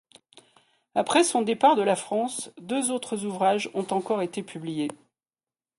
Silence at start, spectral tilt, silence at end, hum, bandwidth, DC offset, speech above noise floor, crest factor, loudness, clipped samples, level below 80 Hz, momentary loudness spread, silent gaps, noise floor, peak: 0.95 s; -3.5 dB/octave; 0.85 s; none; 11.5 kHz; under 0.1%; over 65 dB; 20 dB; -26 LUFS; under 0.1%; -74 dBFS; 11 LU; none; under -90 dBFS; -8 dBFS